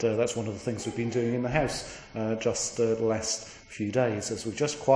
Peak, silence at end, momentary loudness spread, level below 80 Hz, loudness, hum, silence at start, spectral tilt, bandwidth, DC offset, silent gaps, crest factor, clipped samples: -10 dBFS; 0 s; 7 LU; -54 dBFS; -29 LUFS; none; 0 s; -4.5 dB/octave; 10.5 kHz; under 0.1%; none; 20 dB; under 0.1%